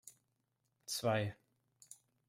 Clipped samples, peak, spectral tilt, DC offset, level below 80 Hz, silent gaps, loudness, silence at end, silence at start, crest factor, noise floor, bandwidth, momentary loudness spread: under 0.1%; -22 dBFS; -4.5 dB/octave; under 0.1%; -78 dBFS; none; -38 LUFS; 0.35 s; 0.05 s; 20 dB; -83 dBFS; 16 kHz; 22 LU